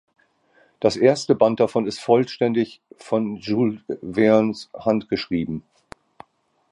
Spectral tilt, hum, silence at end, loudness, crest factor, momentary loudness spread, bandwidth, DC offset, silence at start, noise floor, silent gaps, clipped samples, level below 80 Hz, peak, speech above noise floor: -6 dB/octave; none; 1.1 s; -21 LUFS; 20 dB; 9 LU; 11.5 kHz; under 0.1%; 0.8 s; -64 dBFS; none; under 0.1%; -56 dBFS; -2 dBFS; 43 dB